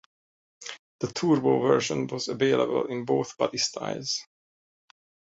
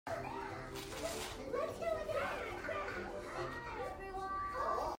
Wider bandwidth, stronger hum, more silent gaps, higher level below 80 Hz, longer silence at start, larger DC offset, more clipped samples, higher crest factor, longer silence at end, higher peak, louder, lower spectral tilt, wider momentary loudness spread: second, 8 kHz vs 16 kHz; neither; first, 0.79-0.99 s vs none; second, -68 dBFS vs -58 dBFS; first, 0.6 s vs 0.05 s; neither; neither; about the same, 20 dB vs 16 dB; first, 1.15 s vs 0 s; first, -8 dBFS vs -26 dBFS; first, -26 LUFS vs -42 LUFS; about the same, -4.5 dB/octave vs -4 dB/octave; first, 14 LU vs 6 LU